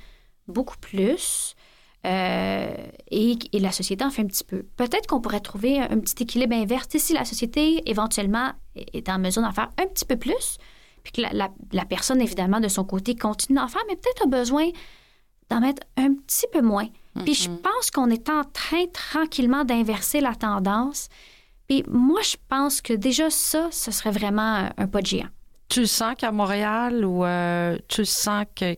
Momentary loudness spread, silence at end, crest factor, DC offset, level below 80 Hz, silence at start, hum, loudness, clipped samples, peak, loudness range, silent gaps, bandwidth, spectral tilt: 8 LU; 0 s; 14 dB; under 0.1%; -46 dBFS; 0.5 s; none; -24 LUFS; under 0.1%; -10 dBFS; 3 LU; none; 17 kHz; -3.5 dB/octave